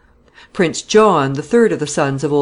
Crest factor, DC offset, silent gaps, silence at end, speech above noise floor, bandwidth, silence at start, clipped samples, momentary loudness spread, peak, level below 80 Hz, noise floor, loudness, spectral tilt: 14 dB; under 0.1%; none; 0 s; 32 dB; 11 kHz; 0.55 s; under 0.1%; 7 LU; -2 dBFS; -52 dBFS; -46 dBFS; -15 LUFS; -5 dB/octave